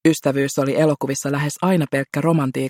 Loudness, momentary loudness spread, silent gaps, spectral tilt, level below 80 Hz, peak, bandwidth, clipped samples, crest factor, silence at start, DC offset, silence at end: -20 LUFS; 4 LU; none; -6 dB/octave; -60 dBFS; -2 dBFS; 16.5 kHz; under 0.1%; 16 dB; 0.05 s; under 0.1%; 0 s